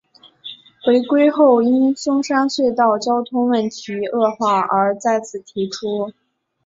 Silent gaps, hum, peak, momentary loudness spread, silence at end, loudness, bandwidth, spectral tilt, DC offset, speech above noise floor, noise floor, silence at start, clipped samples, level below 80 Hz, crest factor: none; none; -2 dBFS; 12 LU; 0.55 s; -17 LUFS; 7.8 kHz; -5 dB/octave; under 0.1%; 22 dB; -39 dBFS; 0.45 s; under 0.1%; -64 dBFS; 16 dB